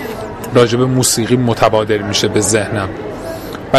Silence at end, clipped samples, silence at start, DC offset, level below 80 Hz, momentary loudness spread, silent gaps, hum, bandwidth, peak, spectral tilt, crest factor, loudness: 0 s; under 0.1%; 0 s; under 0.1%; -38 dBFS; 13 LU; none; none; 15.5 kHz; 0 dBFS; -4.5 dB/octave; 14 dB; -13 LUFS